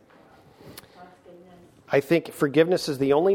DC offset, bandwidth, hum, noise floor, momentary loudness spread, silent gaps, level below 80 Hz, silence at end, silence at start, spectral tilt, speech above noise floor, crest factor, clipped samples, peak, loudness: under 0.1%; 17.5 kHz; none; -54 dBFS; 24 LU; none; -64 dBFS; 0 s; 0.65 s; -6 dB/octave; 30 dB; 20 dB; under 0.1%; -6 dBFS; -23 LUFS